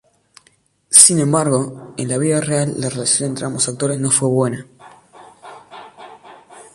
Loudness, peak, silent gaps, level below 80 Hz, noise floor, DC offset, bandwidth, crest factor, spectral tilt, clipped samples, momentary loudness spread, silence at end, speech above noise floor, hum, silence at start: -15 LUFS; 0 dBFS; none; -58 dBFS; -58 dBFS; under 0.1%; 16 kHz; 18 dB; -3.5 dB/octave; under 0.1%; 15 LU; 0.15 s; 40 dB; none; 0.9 s